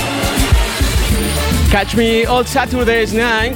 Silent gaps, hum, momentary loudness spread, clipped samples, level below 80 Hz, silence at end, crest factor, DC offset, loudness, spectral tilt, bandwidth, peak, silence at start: none; none; 2 LU; under 0.1%; -20 dBFS; 0 s; 14 dB; under 0.1%; -14 LUFS; -4.5 dB/octave; 17.5 kHz; 0 dBFS; 0 s